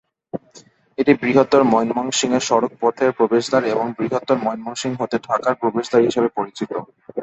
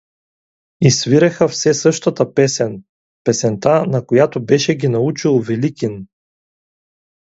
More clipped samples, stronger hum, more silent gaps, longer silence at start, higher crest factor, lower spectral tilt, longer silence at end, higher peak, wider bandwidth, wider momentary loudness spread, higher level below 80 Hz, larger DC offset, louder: neither; neither; second, none vs 2.89-3.25 s; second, 0.35 s vs 0.8 s; about the same, 18 dB vs 16 dB; about the same, -4.5 dB/octave vs -5 dB/octave; second, 0 s vs 1.35 s; about the same, 0 dBFS vs 0 dBFS; about the same, 8.4 kHz vs 8 kHz; first, 13 LU vs 9 LU; about the same, -60 dBFS vs -56 dBFS; neither; second, -19 LUFS vs -15 LUFS